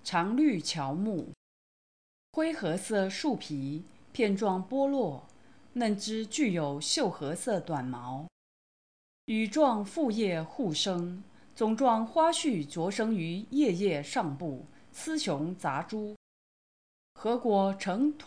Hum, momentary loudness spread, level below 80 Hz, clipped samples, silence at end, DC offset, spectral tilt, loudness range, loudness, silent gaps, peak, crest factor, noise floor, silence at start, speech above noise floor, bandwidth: none; 13 LU; -74 dBFS; under 0.1%; 0 s; 0.1%; -5 dB/octave; 4 LU; -31 LUFS; 1.37-2.33 s, 8.32-9.28 s, 16.16-17.15 s; -14 dBFS; 18 dB; under -90 dBFS; 0.05 s; over 60 dB; 10.5 kHz